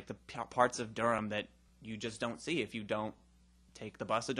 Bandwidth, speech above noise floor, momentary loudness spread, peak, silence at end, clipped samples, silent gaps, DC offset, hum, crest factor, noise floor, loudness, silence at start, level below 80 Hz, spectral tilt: 11.5 kHz; 28 dB; 16 LU; -12 dBFS; 0 s; under 0.1%; none; under 0.1%; none; 26 dB; -65 dBFS; -37 LUFS; 0 s; -66 dBFS; -4.5 dB/octave